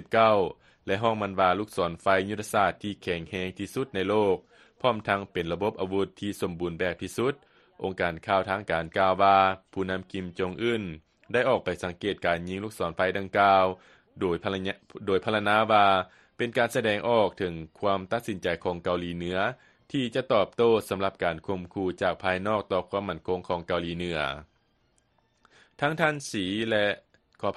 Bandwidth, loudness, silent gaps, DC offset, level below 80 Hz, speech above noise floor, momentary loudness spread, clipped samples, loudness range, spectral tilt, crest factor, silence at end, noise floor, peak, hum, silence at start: 12.5 kHz; -27 LUFS; none; under 0.1%; -58 dBFS; 42 dB; 11 LU; under 0.1%; 5 LU; -5.5 dB/octave; 20 dB; 0 s; -69 dBFS; -6 dBFS; none; 0 s